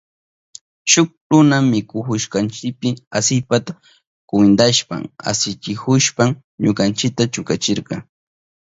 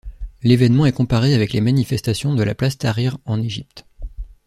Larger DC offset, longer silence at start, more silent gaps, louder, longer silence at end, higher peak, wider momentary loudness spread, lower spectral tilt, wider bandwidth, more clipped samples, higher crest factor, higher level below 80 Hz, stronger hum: neither; first, 0.85 s vs 0.05 s; first, 1.17-1.30 s, 3.07-3.11 s, 4.07-4.28 s, 6.44-6.58 s vs none; about the same, -17 LUFS vs -18 LUFS; first, 0.7 s vs 0.15 s; about the same, 0 dBFS vs -2 dBFS; second, 10 LU vs 17 LU; second, -4 dB/octave vs -7 dB/octave; second, 8 kHz vs 13.5 kHz; neither; about the same, 18 dB vs 16 dB; second, -54 dBFS vs -38 dBFS; neither